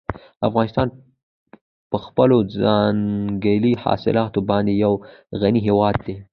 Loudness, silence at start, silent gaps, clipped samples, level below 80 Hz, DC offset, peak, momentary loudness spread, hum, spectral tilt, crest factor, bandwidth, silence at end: -20 LUFS; 0.1 s; 1.23-1.46 s, 1.61-1.90 s; under 0.1%; -46 dBFS; under 0.1%; -2 dBFS; 9 LU; none; -10 dB/octave; 18 dB; 5.4 kHz; 0.1 s